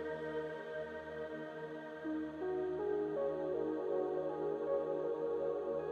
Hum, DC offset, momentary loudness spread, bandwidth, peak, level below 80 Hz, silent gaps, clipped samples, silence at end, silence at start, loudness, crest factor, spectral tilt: none; under 0.1%; 8 LU; 7 kHz; -26 dBFS; -70 dBFS; none; under 0.1%; 0 s; 0 s; -40 LUFS; 14 dB; -7.5 dB/octave